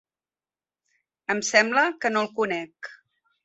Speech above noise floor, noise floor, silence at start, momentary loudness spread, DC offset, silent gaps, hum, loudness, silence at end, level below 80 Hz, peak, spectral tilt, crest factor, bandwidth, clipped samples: over 66 dB; under -90 dBFS; 1.3 s; 20 LU; under 0.1%; none; none; -23 LUFS; 0.5 s; -74 dBFS; -4 dBFS; -2.5 dB/octave; 24 dB; 8.2 kHz; under 0.1%